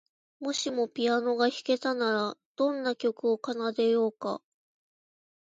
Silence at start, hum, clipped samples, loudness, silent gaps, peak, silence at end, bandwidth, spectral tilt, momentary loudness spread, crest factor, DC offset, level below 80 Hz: 0.4 s; none; under 0.1%; -29 LUFS; 2.46-2.55 s; -12 dBFS; 1.2 s; 9 kHz; -3.5 dB/octave; 8 LU; 18 dB; under 0.1%; -82 dBFS